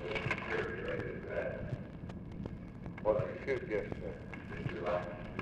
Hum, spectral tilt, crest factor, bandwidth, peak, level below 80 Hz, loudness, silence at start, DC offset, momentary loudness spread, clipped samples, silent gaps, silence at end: none; -7.5 dB/octave; 20 dB; 9.8 kHz; -18 dBFS; -54 dBFS; -39 LUFS; 0 s; under 0.1%; 11 LU; under 0.1%; none; 0 s